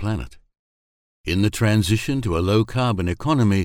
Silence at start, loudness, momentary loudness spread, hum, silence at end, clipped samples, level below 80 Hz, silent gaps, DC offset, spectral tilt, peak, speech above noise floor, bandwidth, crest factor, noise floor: 0 s; -21 LUFS; 9 LU; none; 0 s; under 0.1%; -40 dBFS; 0.59-1.24 s; under 0.1%; -6 dB/octave; -4 dBFS; over 70 dB; 16.5 kHz; 16 dB; under -90 dBFS